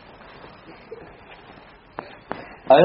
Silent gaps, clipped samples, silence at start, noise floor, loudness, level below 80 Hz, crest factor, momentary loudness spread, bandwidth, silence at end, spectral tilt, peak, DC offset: none; under 0.1%; 2.7 s; -47 dBFS; -27 LUFS; -58 dBFS; 22 dB; 9 LU; 5.6 kHz; 0 s; -4 dB/octave; -2 dBFS; under 0.1%